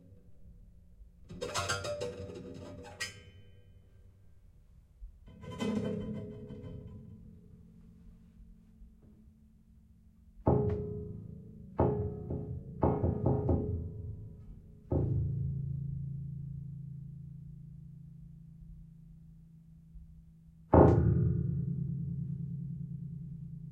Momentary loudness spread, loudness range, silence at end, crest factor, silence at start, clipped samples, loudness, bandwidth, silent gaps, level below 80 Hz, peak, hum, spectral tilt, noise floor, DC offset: 24 LU; 18 LU; 0 s; 28 dB; 0.05 s; under 0.1%; -34 LUFS; 13 kHz; none; -50 dBFS; -8 dBFS; none; -7 dB/octave; -60 dBFS; under 0.1%